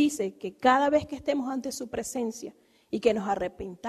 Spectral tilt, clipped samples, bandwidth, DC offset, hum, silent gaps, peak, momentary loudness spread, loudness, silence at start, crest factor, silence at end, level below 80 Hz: -4 dB/octave; under 0.1%; 13.5 kHz; under 0.1%; none; none; -8 dBFS; 12 LU; -28 LUFS; 0 s; 20 dB; 0 s; -60 dBFS